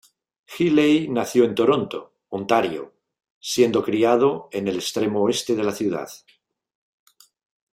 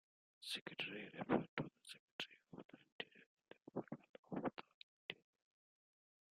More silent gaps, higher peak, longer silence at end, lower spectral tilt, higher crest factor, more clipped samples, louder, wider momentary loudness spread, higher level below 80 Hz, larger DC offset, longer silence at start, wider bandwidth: second, 3.31-3.41 s vs 0.61-0.66 s, 1.49-1.57 s, 1.99-2.19 s, 2.65-2.69 s, 2.92-2.99 s, 3.26-3.37 s, 4.09-4.23 s, 4.74-5.09 s; first, -4 dBFS vs -22 dBFS; first, 1.6 s vs 1.25 s; about the same, -5 dB/octave vs -5 dB/octave; second, 18 dB vs 28 dB; neither; first, -21 LUFS vs -49 LUFS; about the same, 16 LU vs 18 LU; first, -64 dBFS vs -84 dBFS; neither; about the same, 0.5 s vs 0.4 s; first, 16 kHz vs 13 kHz